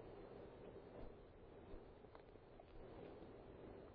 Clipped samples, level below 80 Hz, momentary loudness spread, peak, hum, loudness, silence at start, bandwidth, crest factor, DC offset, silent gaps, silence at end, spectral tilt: under 0.1%; -66 dBFS; 5 LU; -42 dBFS; none; -60 LUFS; 0 s; 4.9 kHz; 16 dB; under 0.1%; none; 0 s; -6.5 dB/octave